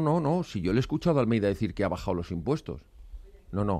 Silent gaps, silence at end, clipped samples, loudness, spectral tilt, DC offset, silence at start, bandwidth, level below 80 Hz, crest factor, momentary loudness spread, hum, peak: none; 0 s; under 0.1%; -28 LUFS; -8 dB/octave; under 0.1%; 0 s; 13.5 kHz; -46 dBFS; 16 dB; 8 LU; none; -12 dBFS